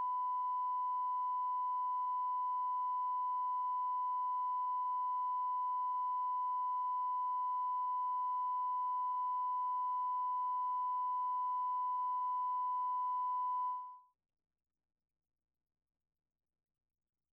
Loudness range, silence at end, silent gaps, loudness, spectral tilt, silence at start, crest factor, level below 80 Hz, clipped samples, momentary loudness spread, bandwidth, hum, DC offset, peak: 3 LU; 3.3 s; none; -37 LUFS; 0.5 dB/octave; 0 s; 4 dB; under -90 dBFS; under 0.1%; 0 LU; 3.2 kHz; 60 Hz at -105 dBFS; under 0.1%; -34 dBFS